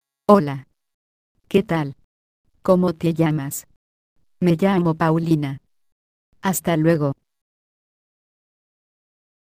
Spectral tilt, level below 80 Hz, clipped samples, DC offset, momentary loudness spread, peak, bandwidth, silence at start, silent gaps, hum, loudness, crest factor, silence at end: -6.5 dB/octave; -54 dBFS; under 0.1%; under 0.1%; 13 LU; 0 dBFS; 15.5 kHz; 0.3 s; 0.94-1.35 s, 2.04-2.44 s, 3.76-4.16 s, 5.92-6.32 s; none; -20 LUFS; 22 dB; 2.3 s